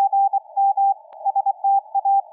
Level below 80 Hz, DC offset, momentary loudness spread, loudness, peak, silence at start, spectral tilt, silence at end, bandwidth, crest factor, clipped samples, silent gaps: under -90 dBFS; under 0.1%; 4 LU; -20 LUFS; -12 dBFS; 0 s; -2.5 dB/octave; 0.1 s; 1 kHz; 8 dB; under 0.1%; none